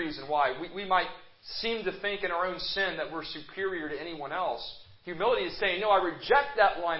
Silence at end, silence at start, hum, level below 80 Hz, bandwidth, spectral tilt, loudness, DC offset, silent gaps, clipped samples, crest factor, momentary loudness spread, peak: 0 s; 0 s; none; -58 dBFS; 5.8 kHz; -7.5 dB/octave; -30 LUFS; under 0.1%; none; under 0.1%; 20 dB; 12 LU; -10 dBFS